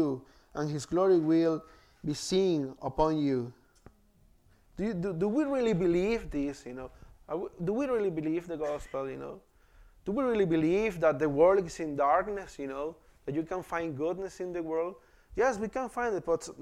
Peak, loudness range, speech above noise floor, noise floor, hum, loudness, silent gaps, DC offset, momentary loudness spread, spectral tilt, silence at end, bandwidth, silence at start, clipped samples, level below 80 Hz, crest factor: -12 dBFS; 6 LU; 34 dB; -64 dBFS; none; -31 LUFS; none; under 0.1%; 14 LU; -6.5 dB/octave; 0 s; 13 kHz; 0 s; under 0.1%; -54 dBFS; 18 dB